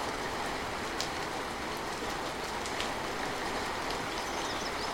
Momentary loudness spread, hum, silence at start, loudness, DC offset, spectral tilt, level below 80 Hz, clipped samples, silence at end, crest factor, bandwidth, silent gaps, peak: 2 LU; none; 0 s; -35 LUFS; under 0.1%; -3 dB/octave; -52 dBFS; under 0.1%; 0 s; 24 dB; 16.5 kHz; none; -10 dBFS